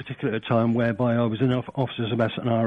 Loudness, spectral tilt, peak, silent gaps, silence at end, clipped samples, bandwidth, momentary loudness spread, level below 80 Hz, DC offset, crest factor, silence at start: -24 LUFS; -9.5 dB/octave; -10 dBFS; none; 0 s; under 0.1%; 4.7 kHz; 6 LU; -60 dBFS; under 0.1%; 14 dB; 0 s